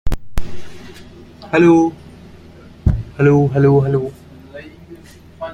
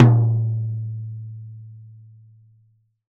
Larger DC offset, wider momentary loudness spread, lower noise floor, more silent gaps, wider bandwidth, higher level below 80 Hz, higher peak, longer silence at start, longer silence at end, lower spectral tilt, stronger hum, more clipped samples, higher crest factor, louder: neither; about the same, 25 LU vs 24 LU; second, -40 dBFS vs -60 dBFS; neither; first, 10.5 kHz vs 3.2 kHz; first, -30 dBFS vs -64 dBFS; about the same, -2 dBFS vs 0 dBFS; about the same, 0.05 s vs 0 s; second, 0 s vs 1.2 s; second, -8.5 dB/octave vs -10 dB/octave; neither; neither; second, 14 dB vs 22 dB; first, -15 LUFS vs -22 LUFS